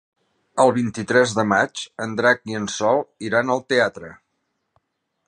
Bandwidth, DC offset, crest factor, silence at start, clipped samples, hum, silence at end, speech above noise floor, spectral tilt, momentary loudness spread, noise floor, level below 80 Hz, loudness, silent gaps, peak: 11 kHz; under 0.1%; 20 dB; 0.55 s; under 0.1%; none; 1.15 s; 54 dB; -4.5 dB/octave; 10 LU; -74 dBFS; -62 dBFS; -20 LUFS; none; -2 dBFS